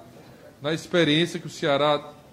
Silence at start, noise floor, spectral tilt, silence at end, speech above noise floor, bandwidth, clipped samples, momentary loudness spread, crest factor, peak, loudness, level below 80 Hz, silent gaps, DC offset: 0 s; -48 dBFS; -5 dB/octave; 0.2 s; 24 dB; 15.5 kHz; under 0.1%; 9 LU; 18 dB; -6 dBFS; -24 LUFS; -64 dBFS; none; under 0.1%